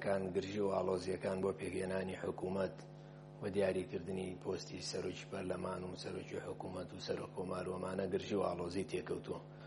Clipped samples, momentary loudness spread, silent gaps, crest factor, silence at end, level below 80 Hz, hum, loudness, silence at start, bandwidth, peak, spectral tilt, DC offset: under 0.1%; 8 LU; none; 20 dB; 0 s; -72 dBFS; none; -41 LUFS; 0 s; 11.5 kHz; -22 dBFS; -6 dB/octave; under 0.1%